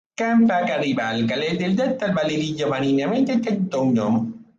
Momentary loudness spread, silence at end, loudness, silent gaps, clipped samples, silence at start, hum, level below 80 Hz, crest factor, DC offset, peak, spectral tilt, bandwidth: 5 LU; 0.15 s; -21 LUFS; none; under 0.1%; 0.2 s; none; -60 dBFS; 12 dB; under 0.1%; -8 dBFS; -6.5 dB/octave; 7.6 kHz